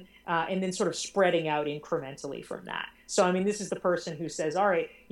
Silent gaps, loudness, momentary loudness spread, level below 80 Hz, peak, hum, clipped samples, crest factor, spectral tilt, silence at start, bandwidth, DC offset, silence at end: none; -30 LUFS; 11 LU; -68 dBFS; -10 dBFS; none; under 0.1%; 18 dB; -4.5 dB/octave; 0 s; 16.5 kHz; under 0.1%; 0.2 s